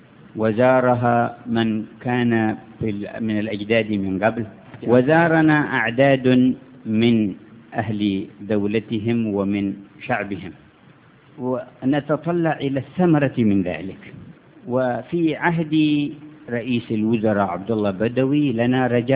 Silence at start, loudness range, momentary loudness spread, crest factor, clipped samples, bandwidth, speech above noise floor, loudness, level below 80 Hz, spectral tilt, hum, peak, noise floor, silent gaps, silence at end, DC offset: 0.35 s; 7 LU; 13 LU; 18 dB; under 0.1%; 4 kHz; 30 dB; -20 LUFS; -54 dBFS; -11 dB/octave; none; -2 dBFS; -50 dBFS; none; 0 s; under 0.1%